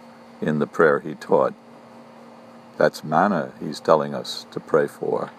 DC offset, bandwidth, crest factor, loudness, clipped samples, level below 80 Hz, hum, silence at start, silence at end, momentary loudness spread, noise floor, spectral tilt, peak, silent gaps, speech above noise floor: under 0.1%; 14 kHz; 22 dB; -22 LUFS; under 0.1%; -68 dBFS; none; 0.05 s; 0.05 s; 11 LU; -45 dBFS; -6 dB/octave; 0 dBFS; none; 23 dB